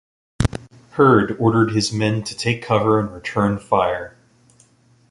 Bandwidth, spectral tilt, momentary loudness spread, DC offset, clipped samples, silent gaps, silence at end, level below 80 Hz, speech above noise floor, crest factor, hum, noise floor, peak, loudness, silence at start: 11.5 kHz; -6 dB/octave; 10 LU; under 0.1%; under 0.1%; none; 1 s; -40 dBFS; 37 dB; 18 dB; none; -55 dBFS; -2 dBFS; -19 LUFS; 0.4 s